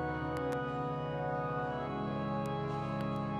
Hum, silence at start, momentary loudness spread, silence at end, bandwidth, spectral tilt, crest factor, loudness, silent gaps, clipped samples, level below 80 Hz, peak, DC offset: none; 0 s; 1 LU; 0 s; 12 kHz; -8 dB/octave; 14 dB; -37 LUFS; none; under 0.1%; -56 dBFS; -22 dBFS; under 0.1%